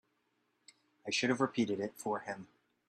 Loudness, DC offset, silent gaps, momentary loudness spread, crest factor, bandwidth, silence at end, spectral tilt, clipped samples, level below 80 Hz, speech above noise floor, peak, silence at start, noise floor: -35 LUFS; under 0.1%; none; 14 LU; 22 dB; 13 kHz; 0.45 s; -4 dB/octave; under 0.1%; -80 dBFS; 44 dB; -16 dBFS; 1.05 s; -79 dBFS